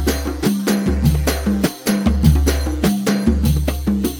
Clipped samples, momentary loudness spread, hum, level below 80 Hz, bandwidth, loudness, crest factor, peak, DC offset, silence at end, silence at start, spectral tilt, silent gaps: under 0.1%; 5 LU; none; -22 dBFS; over 20 kHz; -18 LUFS; 16 dB; 0 dBFS; under 0.1%; 0 s; 0 s; -6 dB/octave; none